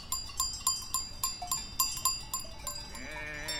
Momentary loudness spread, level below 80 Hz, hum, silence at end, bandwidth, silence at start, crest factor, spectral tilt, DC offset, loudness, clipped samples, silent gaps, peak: 10 LU; -50 dBFS; none; 0 s; 17 kHz; 0 s; 24 dB; 0 dB/octave; under 0.1%; -33 LUFS; under 0.1%; none; -12 dBFS